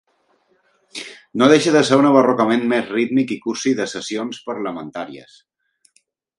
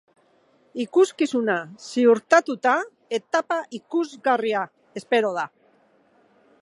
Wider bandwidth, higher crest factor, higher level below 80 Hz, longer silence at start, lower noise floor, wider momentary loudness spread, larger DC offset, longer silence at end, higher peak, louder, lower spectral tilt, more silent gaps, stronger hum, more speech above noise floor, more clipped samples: about the same, 11.5 kHz vs 11.5 kHz; about the same, 18 dB vs 20 dB; first, -66 dBFS vs -82 dBFS; first, 0.95 s vs 0.75 s; about the same, -63 dBFS vs -61 dBFS; first, 19 LU vs 12 LU; neither; about the same, 1.15 s vs 1.15 s; about the same, 0 dBFS vs -2 dBFS; first, -17 LUFS vs -23 LUFS; about the same, -5 dB/octave vs -4 dB/octave; neither; neither; first, 46 dB vs 39 dB; neither